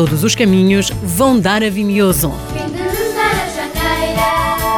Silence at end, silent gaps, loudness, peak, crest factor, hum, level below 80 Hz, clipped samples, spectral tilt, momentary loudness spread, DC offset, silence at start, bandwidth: 0 s; none; -14 LUFS; -2 dBFS; 12 dB; none; -30 dBFS; under 0.1%; -4.5 dB/octave; 8 LU; under 0.1%; 0 s; 19 kHz